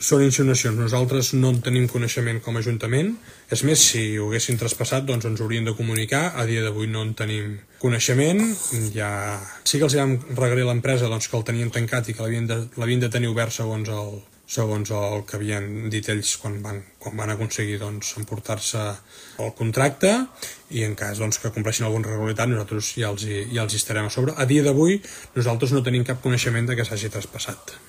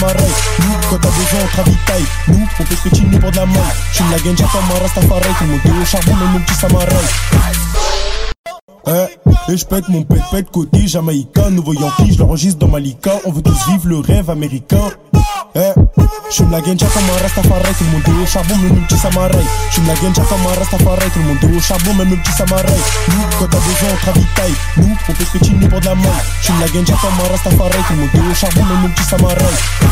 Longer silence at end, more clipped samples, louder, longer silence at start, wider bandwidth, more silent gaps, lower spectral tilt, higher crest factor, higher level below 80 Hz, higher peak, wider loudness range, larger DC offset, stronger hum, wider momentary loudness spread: about the same, 0.1 s vs 0 s; neither; second, -23 LUFS vs -12 LUFS; about the same, 0 s vs 0 s; about the same, 15.5 kHz vs 16.5 kHz; second, none vs 8.39-8.44 s, 8.61-8.68 s; about the same, -4.5 dB/octave vs -5 dB/octave; first, 22 dB vs 12 dB; second, -56 dBFS vs -18 dBFS; about the same, 0 dBFS vs 0 dBFS; first, 6 LU vs 2 LU; neither; neither; first, 11 LU vs 4 LU